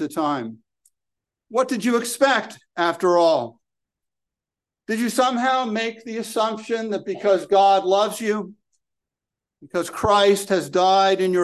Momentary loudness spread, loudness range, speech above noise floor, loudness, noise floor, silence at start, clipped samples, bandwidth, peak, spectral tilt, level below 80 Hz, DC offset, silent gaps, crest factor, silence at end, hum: 11 LU; 3 LU; 69 dB; -20 LUFS; -89 dBFS; 0 s; under 0.1%; 12.5 kHz; -4 dBFS; -4 dB/octave; -56 dBFS; under 0.1%; none; 18 dB; 0 s; none